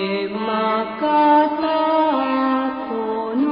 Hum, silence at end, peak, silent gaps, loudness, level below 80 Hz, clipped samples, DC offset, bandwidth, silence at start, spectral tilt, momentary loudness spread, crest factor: none; 0 s; -4 dBFS; none; -19 LUFS; -60 dBFS; under 0.1%; under 0.1%; 5.2 kHz; 0 s; -10 dB/octave; 9 LU; 14 dB